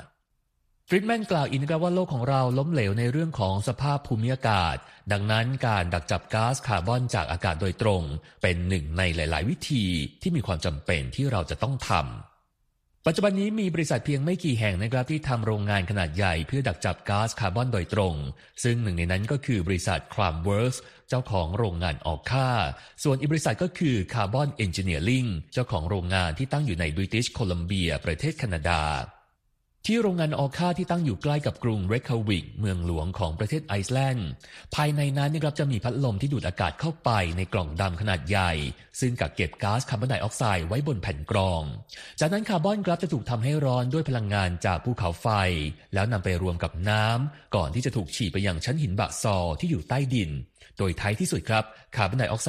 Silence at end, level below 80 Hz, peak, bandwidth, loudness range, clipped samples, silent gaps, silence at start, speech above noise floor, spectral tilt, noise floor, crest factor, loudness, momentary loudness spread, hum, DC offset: 0 s; -42 dBFS; -8 dBFS; 14 kHz; 2 LU; under 0.1%; none; 0 s; 47 dB; -6 dB/octave; -73 dBFS; 20 dB; -27 LUFS; 5 LU; none; under 0.1%